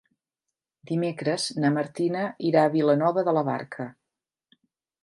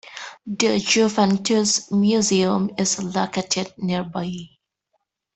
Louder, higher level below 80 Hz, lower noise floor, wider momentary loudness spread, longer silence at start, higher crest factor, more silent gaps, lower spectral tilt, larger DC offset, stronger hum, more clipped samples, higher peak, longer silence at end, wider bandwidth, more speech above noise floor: second, -25 LUFS vs -20 LUFS; second, -76 dBFS vs -60 dBFS; first, -87 dBFS vs -73 dBFS; about the same, 10 LU vs 12 LU; first, 0.9 s vs 0.05 s; about the same, 20 dB vs 18 dB; neither; first, -6 dB/octave vs -4 dB/octave; neither; neither; neither; about the same, -6 dBFS vs -4 dBFS; first, 1.15 s vs 0.9 s; first, 11.5 kHz vs 8.6 kHz; first, 63 dB vs 53 dB